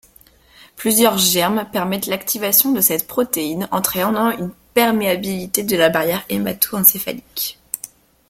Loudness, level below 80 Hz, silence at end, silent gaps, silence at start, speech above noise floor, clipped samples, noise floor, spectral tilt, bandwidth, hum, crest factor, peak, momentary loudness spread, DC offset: -17 LUFS; -54 dBFS; 0.45 s; none; 0.75 s; 32 dB; under 0.1%; -50 dBFS; -3 dB/octave; 16.5 kHz; none; 18 dB; 0 dBFS; 12 LU; under 0.1%